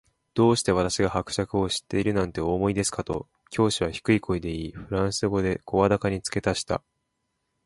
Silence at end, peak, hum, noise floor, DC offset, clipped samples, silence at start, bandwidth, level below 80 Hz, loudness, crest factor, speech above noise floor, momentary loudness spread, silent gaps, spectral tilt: 0.85 s; -6 dBFS; none; -77 dBFS; under 0.1%; under 0.1%; 0.35 s; 12 kHz; -46 dBFS; -26 LUFS; 20 dB; 52 dB; 9 LU; none; -5 dB/octave